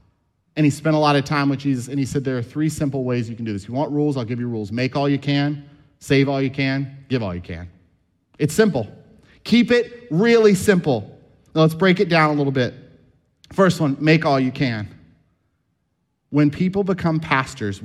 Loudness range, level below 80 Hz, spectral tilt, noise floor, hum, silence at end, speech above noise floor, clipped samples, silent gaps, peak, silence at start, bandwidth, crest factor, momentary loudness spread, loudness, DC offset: 5 LU; -52 dBFS; -6.5 dB/octave; -71 dBFS; none; 0 s; 52 dB; under 0.1%; none; -2 dBFS; 0.55 s; 14 kHz; 18 dB; 11 LU; -20 LUFS; under 0.1%